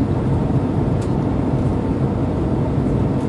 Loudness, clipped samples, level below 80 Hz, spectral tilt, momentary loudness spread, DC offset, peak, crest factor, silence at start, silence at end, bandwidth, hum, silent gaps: -19 LUFS; under 0.1%; -30 dBFS; -9.5 dB/octave; 1 LU; under 0.1%; -6 dBFS; 12 dB; 0 s; 0 s; 11 kHz; none; none